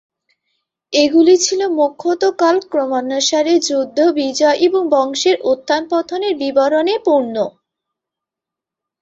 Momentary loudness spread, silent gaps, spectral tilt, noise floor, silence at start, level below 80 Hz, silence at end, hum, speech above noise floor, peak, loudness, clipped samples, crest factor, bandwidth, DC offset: 7 LU; none; -2 dB/octave; -85 dBFS; 0.9 s; -64 dBFS; 1.55 s; none; 71 dB; -2 dBFS; -15 LUFS; under 0.1%; 14 dB; 8 kHz; under 0.1%